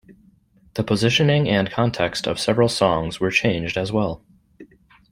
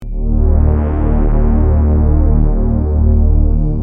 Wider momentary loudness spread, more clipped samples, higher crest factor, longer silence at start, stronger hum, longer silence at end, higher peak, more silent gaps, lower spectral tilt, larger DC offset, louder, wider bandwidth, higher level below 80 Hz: first, 8 LU vs 3 LU; neither; first, 20 dB vs 10 dB; about the same, 0.1 s vs 0 s; neither; first, 0.5 s vs 0 s; about the same, -2 dBFS vs -2 dBFS; neither; second, -5.5 dB/octave vs -13 dB/octave; neither; second, -20 LUFS vs -14 LUFS; first, 16 kHz vs 2.5 kHz; second, -48 dBFS vs -12 dBFS